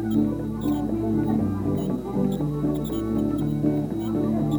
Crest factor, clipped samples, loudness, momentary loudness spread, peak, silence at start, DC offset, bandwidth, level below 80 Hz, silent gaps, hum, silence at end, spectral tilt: 14 dB; under 0.1%; -25 LUFS; 3 LU; -10 dBFS; 0 s; under 0.1%; 20 kHz; -42 dBFS; none; none; 0 s; -9 dB/octave